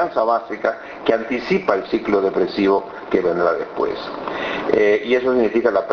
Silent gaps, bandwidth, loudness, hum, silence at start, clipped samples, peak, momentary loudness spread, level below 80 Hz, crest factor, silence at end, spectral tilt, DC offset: none; 6.6 kHz; -19 LUFS; none; 0 s; under 0.1%; 0 dBFS; 7 LU; -52 dBFS; 18 dB; 0 s; -3.5 dB/octave; under 0.1%